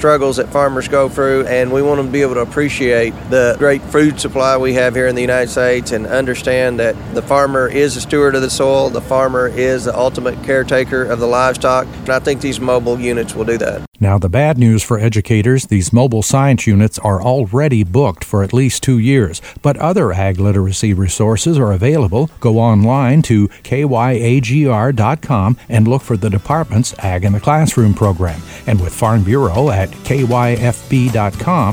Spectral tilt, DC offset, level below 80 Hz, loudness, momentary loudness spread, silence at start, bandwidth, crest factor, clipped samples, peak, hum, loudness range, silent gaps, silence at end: -6 dB/octave; under 0.1%; -36 dBFS; -14 LUFS; 5 LU; 0 s; 16.5 kHz; 12 dB; under 0.1%; 0 dBFS; none; 2 LU; 13.88-13.92 s; 0 s